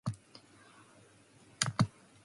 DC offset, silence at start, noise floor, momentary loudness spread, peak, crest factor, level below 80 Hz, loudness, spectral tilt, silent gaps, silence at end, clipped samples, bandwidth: under 0.1%; 0.05 s; -62 dBFS; 26 LU; -8 dBFS; 32 dB; -64 dBFS; -35 LUFS; -4 dB/octave; none; 0.35 s; under 0.1%; 11.5 kHz